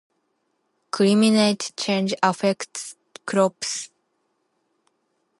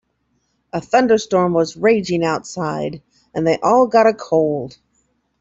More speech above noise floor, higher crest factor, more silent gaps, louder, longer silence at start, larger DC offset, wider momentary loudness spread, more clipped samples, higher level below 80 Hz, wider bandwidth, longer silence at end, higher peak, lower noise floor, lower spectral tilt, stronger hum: about the same, 51 dB vs 51 dB; first, 22 dB vs 16 dB; neither; second, -21 LUFS vs -17 LUFS; first, 0.95 s vs 0.75 s; neither; first, 17 LU vs 14 LU; neither; second, -74 dBFS vs -56 dBFS; first, 11.5 kHz vs 7.8 kHz; first, 1.55 s vs 0.7 s; about the same, -2 dBFS vs -2 dBFS; first, -72 dBFS vs -67 dBFS; about the same, -4.5 dB/octave vs -5.5 dB/octave; neither